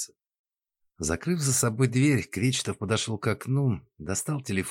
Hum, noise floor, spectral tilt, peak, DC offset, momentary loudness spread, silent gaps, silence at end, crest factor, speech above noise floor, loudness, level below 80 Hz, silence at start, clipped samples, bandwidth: none; -79 dBFS; -4.5 dB/octave; -12 dBFS; under 0.1%; 8 LU; 0.39-0.45 s; 0 s; 16 dB; 52 dB; -27 LUFS; -54 dBFS; 0 s; under 0.1%; 17 kHz